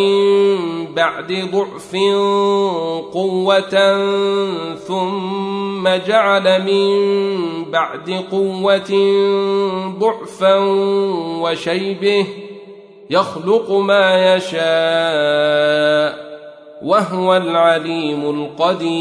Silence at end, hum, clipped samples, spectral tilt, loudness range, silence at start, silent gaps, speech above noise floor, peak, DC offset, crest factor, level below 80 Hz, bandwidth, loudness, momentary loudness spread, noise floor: 0 s; none; under 0.1%; -5.5 dB/octave; 2 LU; 0 s; none; 22 dB; -2 dBFS; under 0.1%; 14 dB; -64 dBFS; 10.5 kHz; -16 LUFS; 8 LU; -38 dBFS